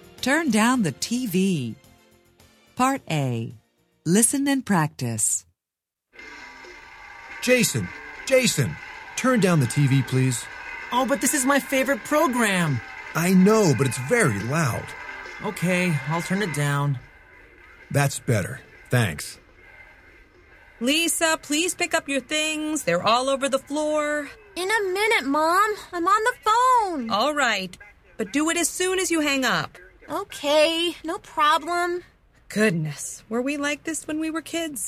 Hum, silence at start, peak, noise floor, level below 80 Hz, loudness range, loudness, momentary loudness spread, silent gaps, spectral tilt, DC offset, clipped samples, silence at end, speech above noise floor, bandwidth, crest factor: none; 0.2 s; -4 dBFS; -87 dBFS; -56 dBFS; 5 LU; -22 LUFS; 14 LU; none; -4 dB/octave; under 0.1%; under 0.1%; 0 s; 65 dB; 16 kHz; 20 dB